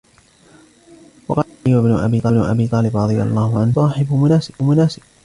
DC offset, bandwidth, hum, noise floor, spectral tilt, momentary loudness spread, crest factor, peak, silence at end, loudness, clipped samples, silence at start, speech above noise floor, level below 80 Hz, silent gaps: under 0.1%; 11 kHz; none; -50 dBFS; -8.5 dB/octave; 5 LU; 14 dB; -2 dBFS; 0.3 s; -16 LUFS; under 0.1%; 1.3 s; 35 dB; -44 dBFS; none